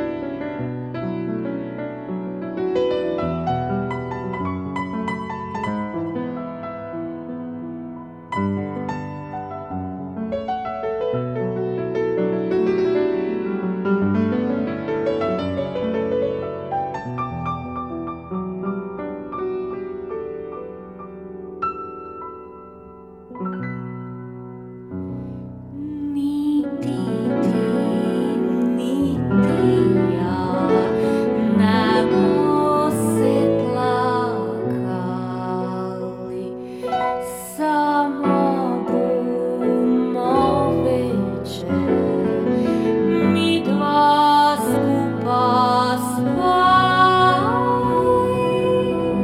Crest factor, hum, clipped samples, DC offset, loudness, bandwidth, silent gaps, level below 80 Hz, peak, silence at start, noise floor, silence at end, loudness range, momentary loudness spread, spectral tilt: 18 dB; none; under 0.1%; under 0.1%; -21 LUFS; 16 kHz; none; -50 dBFS; -2 dBFS; 0 s; -41 dBFS; 0 s; 13 LU; 14 LU; -6.5 dB/octave